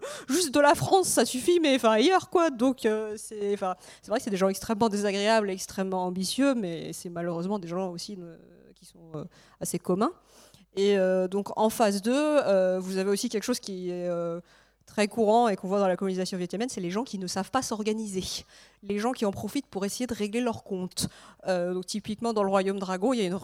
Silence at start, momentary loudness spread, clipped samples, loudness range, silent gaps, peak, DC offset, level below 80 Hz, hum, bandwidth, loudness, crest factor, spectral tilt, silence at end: 0 s; 12 LU; under 0.1%; 6 LU; none; -8 dBFS; under 0.1%; -62 dBFS; none; 16.5 kHz; -27 LUFS; 20 dB; -4.5 dB/octave; 0 s